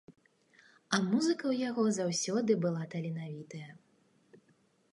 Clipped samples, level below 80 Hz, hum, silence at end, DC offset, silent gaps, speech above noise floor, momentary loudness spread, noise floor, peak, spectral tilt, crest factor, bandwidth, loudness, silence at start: under 0.1%; -80 dBFS; none; 0.55 s; under 0.1%; none; 38 dB; 15 LU; -70 dBFS; -14 dBFS; -5 dB/octave; 20 dB; 11.5 kHz; -32 LUFS; 0.1 s